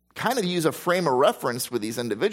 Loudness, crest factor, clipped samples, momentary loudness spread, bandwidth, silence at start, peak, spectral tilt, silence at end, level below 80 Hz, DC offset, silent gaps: -24 LUFS; 18 dB; under 0.1%; 7 LU; 16.5 kHz; 0.15 s; -6 dBFS; -4.5 dB/octave; 0 s; -68 dBFS; under 0.1%; none